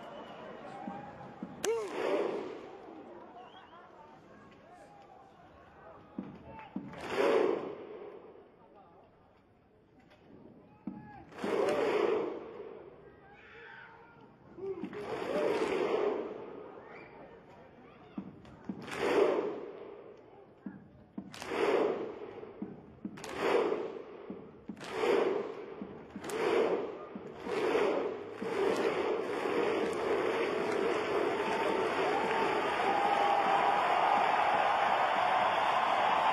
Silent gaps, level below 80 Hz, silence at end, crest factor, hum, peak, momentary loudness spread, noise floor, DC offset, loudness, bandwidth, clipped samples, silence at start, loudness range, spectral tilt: none; -70 dBFS; 0 s; 20 dB; none; -14 dBFS; 21 LU; -64 dBFS; under 0.1%; -32 LUFS; 13 kHz; under 0.1%; 0 s; 15 LU; -4.5 dB/octave